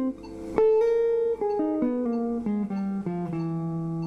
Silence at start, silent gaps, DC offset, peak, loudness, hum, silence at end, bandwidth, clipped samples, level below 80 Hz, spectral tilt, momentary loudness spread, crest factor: 0 s; none; under 0.1%; -8 dBFS; -26 LUFS; none; 0 s; 6.6 kHz; under 0.1%; -54 dBFS; -9.5 dB/octave; 8 LU; 18 dB